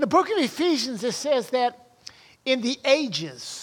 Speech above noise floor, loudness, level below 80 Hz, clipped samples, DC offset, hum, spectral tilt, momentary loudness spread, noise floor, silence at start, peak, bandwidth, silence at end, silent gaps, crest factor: 24 dB; -24 LUFS; -72 dBFS; under 0.1%; under 0.1%; none; -3.5 dB/octave; 21 LU; -48 dBFS; 0 s; -6 dBFS; 17.5 kHz; 0 s; none; 18 dB